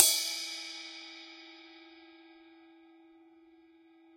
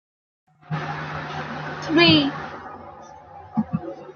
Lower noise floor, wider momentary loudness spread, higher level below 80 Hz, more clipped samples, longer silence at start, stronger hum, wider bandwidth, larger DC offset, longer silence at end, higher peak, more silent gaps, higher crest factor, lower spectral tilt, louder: first, -61 dBFS vs -43 dBFS; about the same, 25 LU vs 26 LU; second, -90 dBFS vs -58 dBFS; neither; second, 0 s vs 0.7 s; neither; first, 16.5 kHz vs 7 kHz; neither; first, 2.3 s vs 0 s; about the same, -2 dBFS vs -2 dBFS; neither; first, 34 dB vs 22 dB; second, 3.5 dB/octave vs -6 dB/octave; second, -32 LUFS vs -22 LUFS